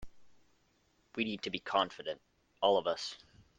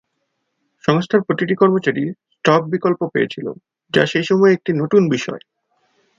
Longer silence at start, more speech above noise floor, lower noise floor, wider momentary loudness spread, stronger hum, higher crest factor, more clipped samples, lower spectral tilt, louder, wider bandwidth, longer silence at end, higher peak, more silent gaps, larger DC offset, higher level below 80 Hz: second, 0 s vs 0.9 s; second, 39 dB vs 56 dB; about the same, -73 dBFS vs -72 dBFS; first, 15 LU vs 10 LU; neither; about the same, 22 dB vs 18 dB; neither; second, -4 dB/octave vs -6.5 dB/octave; second, -35 LUFS vs -17 LUFS; first, 9.8 kHz vs 7.6 kHz; second, 0.4 s vs 0.8 s; second, -14 dBFS vs 0 dBFS; neither; neither; second, -66 dBFS vs -60 dBFS